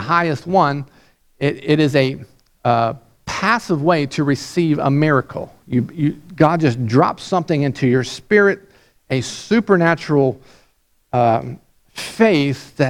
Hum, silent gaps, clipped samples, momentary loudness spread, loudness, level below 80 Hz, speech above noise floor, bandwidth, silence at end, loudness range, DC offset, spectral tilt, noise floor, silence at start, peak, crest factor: none; none; under 0.1%; 13 LU; -17 LUFS; -52 dBFS; 42 dB; 14 kHz; 0 s; 2 LU; under 0.1%; -6.5 dB/octave; -59 dBFS; 0 s; 0 dBFS; 18 dB